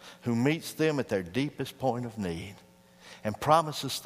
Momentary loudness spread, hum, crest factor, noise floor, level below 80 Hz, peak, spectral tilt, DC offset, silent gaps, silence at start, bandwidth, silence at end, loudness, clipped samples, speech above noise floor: 13 LU; none; 22 dB; -53 dBFS; -62 dBFS; -8 dBFS; -5.5 dB/octave; under 0.1%; none; 0 s; 15.5 kHz; 0 s; -30 LUFS; under 0.1%; 24 dB